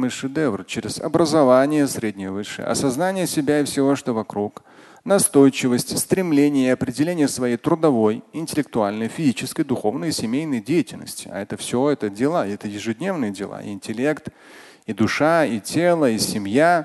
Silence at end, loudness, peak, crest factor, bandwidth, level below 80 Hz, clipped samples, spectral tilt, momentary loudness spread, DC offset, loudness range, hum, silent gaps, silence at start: 0 s; -21 LUFS; -2 dBFS; 18 dB; 12.5 kHz; -56 dBFS; under 0.1%; -5 dB/octave; 12 LU; under 0.1%; 5 LU; none; none; 0 s